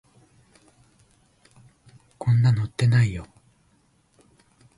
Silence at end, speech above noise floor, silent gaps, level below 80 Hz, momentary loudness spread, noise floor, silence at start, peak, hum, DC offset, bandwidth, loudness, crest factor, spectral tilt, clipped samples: 1.55 s; 43 dB; none; -52 dBFS; 9 LU; -63 dBFS; 2.2 s; -10 dBFS; none; under 0.1%; 11.5 kHz; -22 LUFS; 16 dB; -7 dB/octave; under 0.1%